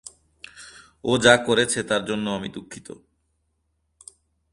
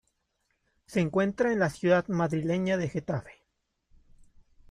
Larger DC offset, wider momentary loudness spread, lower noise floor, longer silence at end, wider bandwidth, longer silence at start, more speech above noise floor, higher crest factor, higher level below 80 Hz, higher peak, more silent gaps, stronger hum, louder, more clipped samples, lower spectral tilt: neither; first, 26 LU vs 8 LU; second, -72 dBFS vs -78 dBFS; first, 1.6 s vs 1.4 s; about the same, 11.5 kHz vs 12 kHz; second, 0.55 s vs 0.9 s; about the same, 50 dB vs 51 dB; first, 24 dB vs 18 dB; about the same, -58 dBFS vs -60 dBFS; first, 0 dBFS vs -12 dBFS; neither; neither; first, -21 LUFS vs -28 LUFS; neither; second, -3.5 dB/octave vs -7 dB/octave